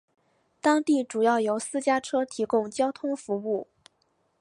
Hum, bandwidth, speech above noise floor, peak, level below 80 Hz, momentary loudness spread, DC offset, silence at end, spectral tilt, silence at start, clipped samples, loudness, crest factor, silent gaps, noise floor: none; 11.5 kHz; 45 dB; -10 dBFS; -74 dBFS; 7 LU; under 0.1%; 0.8 s; -4 dB/octave; 0.65 s; under 0.1%; -26 LUFS; 18 dB; none; -71 dBFS